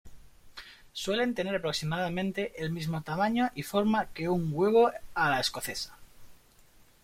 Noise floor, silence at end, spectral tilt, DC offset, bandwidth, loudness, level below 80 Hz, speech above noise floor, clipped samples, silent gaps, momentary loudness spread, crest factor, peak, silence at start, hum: -59 dBFS; 0.7 s; -5 dB/octave; under 0.1%; 16.5 kHz; -30 LUFS; -58 dBFS; 30 dB; under 0.1%; none; 14 LU; 18 dB; -12 dBFS; 0.05 s; none